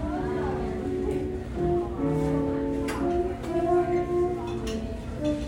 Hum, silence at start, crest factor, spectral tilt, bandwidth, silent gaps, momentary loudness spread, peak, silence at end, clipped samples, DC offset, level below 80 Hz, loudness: none; 0 s; 14 dB; -7.5 dB/octave; 16 kHz; none; 7 LU; -14 dBFS; 0 s; under 0.1%; under 0.1%; -38 dBFS; -28 LUFS